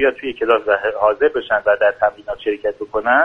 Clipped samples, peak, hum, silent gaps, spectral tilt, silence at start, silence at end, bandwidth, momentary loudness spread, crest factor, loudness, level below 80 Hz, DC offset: under 0.1%; 0 dBFS; none; none; -5.5 dB/octave; 0 s; 0 s; 4.9 kHz; 7 LU; 16 dB; -18 LUFS; -50 dBFS; under 0.1%